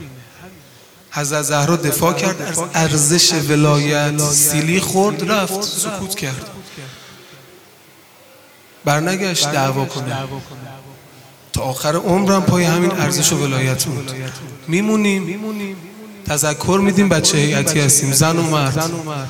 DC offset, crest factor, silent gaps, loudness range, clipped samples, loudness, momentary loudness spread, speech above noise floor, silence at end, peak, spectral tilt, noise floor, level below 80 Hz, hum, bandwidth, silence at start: under 0.1%; 18 dB; none; 7 LU; under 0.1%; -16 LUFS; 17 LU; 29 dB; 0 s; 0 dBFS; -4 dB/octave; -46 dBFS; -50 dBFS; none; 18 kHz; 0 s